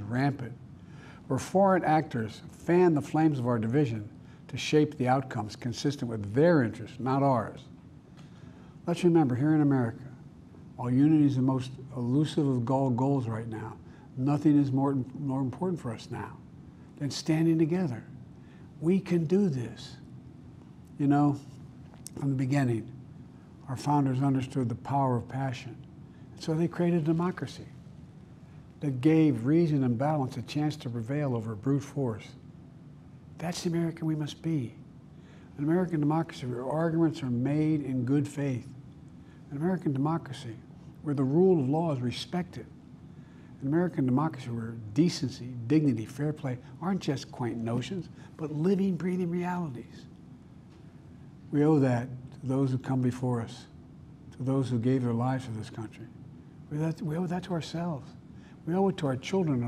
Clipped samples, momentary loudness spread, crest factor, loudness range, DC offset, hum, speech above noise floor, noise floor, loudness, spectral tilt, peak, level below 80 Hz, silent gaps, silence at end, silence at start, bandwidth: under 0.1%; 24 LU; 18 dB; 5 LU; under 0.1%; none; 23 dB; -51 dBFS; -29 LUFS; -7.5 dB/octave; -12 dBFS; -62 dBFS; none; 0 s; 0 s; 12.5 kHz